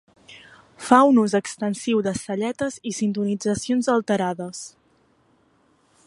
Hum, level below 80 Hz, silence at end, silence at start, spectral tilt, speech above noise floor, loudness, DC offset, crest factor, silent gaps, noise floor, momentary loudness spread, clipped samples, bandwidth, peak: none; -62 dBFS; 1.4 s; 0.3 s; -5 dB/octave; 40 dB; -22 LUFS; under 0.1%; 22 dB; none; -62 dBFS; 15 LU; under 0.1%; 11.5 kHz; 0 dBFS